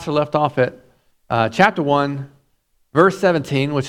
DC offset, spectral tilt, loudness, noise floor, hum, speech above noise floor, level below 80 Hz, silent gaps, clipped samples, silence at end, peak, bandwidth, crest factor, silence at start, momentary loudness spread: under 0.1%; -6.5 dB/octave; -18 LUFS; -63 dBFS; none; 46 dB; -56 dBFS; none; under 0.1%; 0 s; 0 dBFS; 14.5 kHz; 18 dB; 0 s; 9 LU